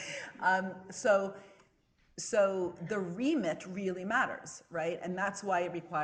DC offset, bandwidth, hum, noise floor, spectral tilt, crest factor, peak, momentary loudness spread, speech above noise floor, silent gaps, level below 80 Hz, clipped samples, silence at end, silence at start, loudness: under 0.1%; 10 kHz; none; -70 dBFS; -4.5 dB/octave; 18 dB; -16 dBFS; 12 LU; 37 dB; none; -74 dBFS; under 0.1%; 0 s; 0 s; -33 LUFS